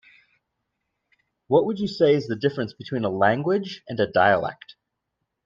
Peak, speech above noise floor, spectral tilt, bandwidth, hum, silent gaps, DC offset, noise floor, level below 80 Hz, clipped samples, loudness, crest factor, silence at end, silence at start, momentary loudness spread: -4 dBFS; 58 dB; -7 dB/octave; 7.4 kHz; none; none; under 0.1%; -80 dBFS; -64 dBFS; under 0.1%; -23 LUFS; 20 dB; 0.9 s; 1.5 s; 10 LU